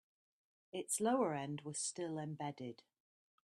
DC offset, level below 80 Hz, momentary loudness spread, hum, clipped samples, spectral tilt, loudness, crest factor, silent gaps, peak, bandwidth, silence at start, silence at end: under 0.1%; -86 dBFS; 15 LU; none; under 0.1%; -4 dB/octave; -41 LUFS; 20 dB; none; -24 dBFS; 13 kHz; 0.75 s; 0.75 s